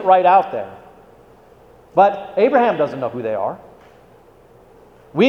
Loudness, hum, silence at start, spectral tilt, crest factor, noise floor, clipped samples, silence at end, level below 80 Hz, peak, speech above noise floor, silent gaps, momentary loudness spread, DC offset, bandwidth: -17 LUFS; none; 0 s; -7 dB/octave; 18 dB; -48 dBFS; under 0.1%; 0 s; -58 dBFS; 0 dBFS; 32 dB; none; 15 LU; under 0.1%; 6.4 kHz